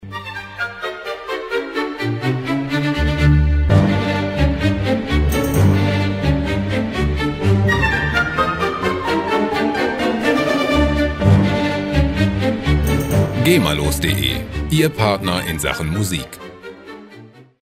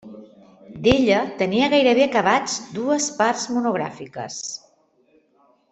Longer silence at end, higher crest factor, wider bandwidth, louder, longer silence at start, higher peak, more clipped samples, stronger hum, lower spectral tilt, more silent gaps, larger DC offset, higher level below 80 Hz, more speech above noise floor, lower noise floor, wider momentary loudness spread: second, 0.2 s vs 1.15 s; about the same, 16 dB vs 20 dB; first, 16 kHz vs 8.4 kHz; about the same, -18 LUFS vs -20 LUFS; about the same, 0 s vs 0.05 s; about the same, 0 dBFS vs -2 dBFS; neither; neither; first, -6 dB/octave vs -3.5 dB/octave; neither; neither; first, -26 dBFS vs -52 dBFS; second, 23 dB vs 40 dB; second, -42 dBFS vs -60 dBFS; second, 11 LU vs 14 LU